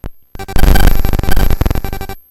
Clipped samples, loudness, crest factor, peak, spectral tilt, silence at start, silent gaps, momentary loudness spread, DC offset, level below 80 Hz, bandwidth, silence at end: 3%; -16 LUFS; 10 dB; 0 dBFS; -5.5 dB/octave; 0.05 s; none; 15 LU; under 0.1%; -12 dBFS; 16.5 kHz; 0.1 s